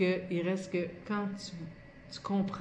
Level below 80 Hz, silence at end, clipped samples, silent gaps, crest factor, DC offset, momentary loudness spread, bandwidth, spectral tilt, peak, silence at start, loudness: -64 dBFS; 0 s; under 0.1%; none; 16 dB; under 0.1%; 14 LU; 9.8 kHz; -6.5 dB/octave; -18 dBFS; 0 s; -35 LUFS